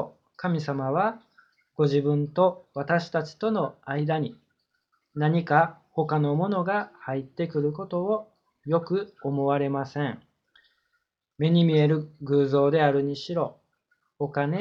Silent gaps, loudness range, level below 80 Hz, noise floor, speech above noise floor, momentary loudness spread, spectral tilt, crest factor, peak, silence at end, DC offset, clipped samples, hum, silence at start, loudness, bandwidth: none; 4 LU; -68 dBFS; -77 dBFS; 52 dB; 11 LU; -8.5 dB/octave; 22 dB; -4 dBFS; 0 s; under 0.1%; under 0.1%; none; 0 s; -26 LUFS; 7 kHz